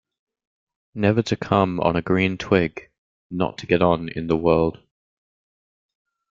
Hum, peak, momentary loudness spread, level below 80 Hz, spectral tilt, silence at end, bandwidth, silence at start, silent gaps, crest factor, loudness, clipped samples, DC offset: none; -2 dBFS; 8 LU; -50 dBFS; -7 dB/octave; 1.55 s; 7.6 kHz; 0.95 s; 2.98-3.30 s; 20 dB; -21 LUFS; under 0.1%; under 0.1%